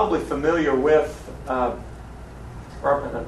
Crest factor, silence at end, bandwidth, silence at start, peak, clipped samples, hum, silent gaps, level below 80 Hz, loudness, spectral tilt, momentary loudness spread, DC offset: 18 dB; 0 s; 12.5 kHz; 0 s; -6 dBFS; under 0.1%; none; none; -40 dBFS; -22 LUFS; -6.5 dB/octave; 21 LU; under 0.1%